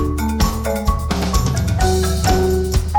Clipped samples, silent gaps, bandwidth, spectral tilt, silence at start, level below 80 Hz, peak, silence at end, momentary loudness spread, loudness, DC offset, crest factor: under 0.1%; none; 19.5 kHz; -5.5 dB/octave; 0 s; -20 dBFS; -4 dBFS; 0 s; 4 LU; -18 LUFS; under 0.1%; 14 dB